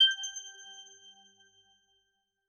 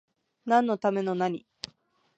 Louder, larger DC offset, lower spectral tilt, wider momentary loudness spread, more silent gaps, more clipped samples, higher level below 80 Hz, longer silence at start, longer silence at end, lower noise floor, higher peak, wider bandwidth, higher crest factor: second, -31 LUFS vs -27 LUFS; neither; second, 5 dB/octave vs -6.5 dB/octave; first, 24 LU vs 18 LU; neither; neither; second, -84 dBFS vs -76 dBFS; second, 0 s vs 0.45 s; first, 1.65 s vs 0.8 s; first, -79 dBFS vs -62 dBFS; second, -16 dBFS vs -10 dBFS; first, 13.5 kHz vs 8.6 kHz; about the same, 20 dB vs 20 dB